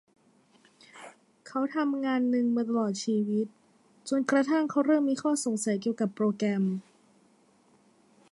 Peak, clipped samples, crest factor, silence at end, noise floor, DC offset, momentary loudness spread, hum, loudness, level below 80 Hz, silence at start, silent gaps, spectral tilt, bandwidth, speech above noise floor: -12 dBFS; under 0.1%; 18 dB; 1.5 s; -64 dBFS; under 0.1%; 12 LU; none; -28 LUFS; -80 dBFS; 0.95 s; none; -5.5 dB/octave; 11.5 kHz; 36 dB